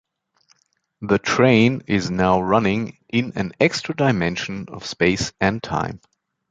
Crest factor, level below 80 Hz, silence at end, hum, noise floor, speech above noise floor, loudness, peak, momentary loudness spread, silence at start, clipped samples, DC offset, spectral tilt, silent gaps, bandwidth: 18 dB; -46 dBFS; 0.55 s; none; -63 dBFS; 43 dB; -20 LUFS; -2 dBFS; 13 LU; 1 s; under 0.1%; under 0.1%; -5.5 dB/octave; none; 9.2 kHz